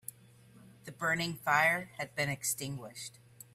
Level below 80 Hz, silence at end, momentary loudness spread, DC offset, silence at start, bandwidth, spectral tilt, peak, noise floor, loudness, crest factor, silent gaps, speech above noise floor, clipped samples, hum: -70 dBFS; 0.45 s; 20 LU; under 0.1%; 0.55 s; 16 kHz; -3 dB/octave; -14 dBFS; -59 dBFS; -32 LUFS; 22 dB; none; 26 dB; under 0.1%; none